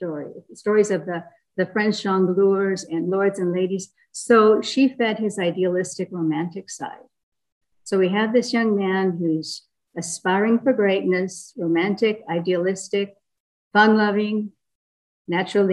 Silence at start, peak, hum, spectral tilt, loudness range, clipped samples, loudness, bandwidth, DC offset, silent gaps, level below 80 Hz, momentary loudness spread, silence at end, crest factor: 0 s; -2 dBFS; none; -5.5 dB/octave; 4 LU; under 0.1%; -21 LUFS; 12 kHz; under 0.1%; 7.23-7.32 s, 7.52-7.61 s, 13.40-13.71 s, 14.75-15.25 s; -72 dBFS; 15 LU; 0 s; 18 dB